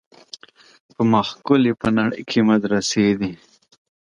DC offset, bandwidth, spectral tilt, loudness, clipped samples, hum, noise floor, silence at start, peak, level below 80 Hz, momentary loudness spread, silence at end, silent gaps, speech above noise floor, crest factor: under 0.1%; 11 kHz; -5.5 dB/octave; -19 LUFS; under 0.1%; none; -44 dBFS; 1 s; -2 dBFS; -52 dBFS; 22 LU; 0.7 s; none; 25 dB; 18 dB